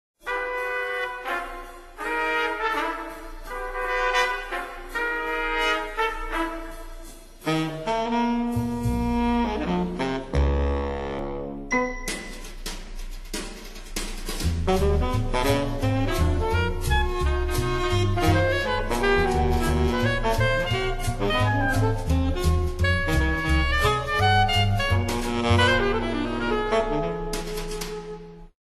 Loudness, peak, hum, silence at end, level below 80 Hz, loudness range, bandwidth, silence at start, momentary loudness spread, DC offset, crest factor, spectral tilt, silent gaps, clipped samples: -25 LUFS; -8 dBFS; none; 0.2 s; -30 dBFS; 6 LU; 13 kHz; 0.25 s; 12 LU; under 0.1%; 16 dB; -5.5 dB/octave; none; under 0.1%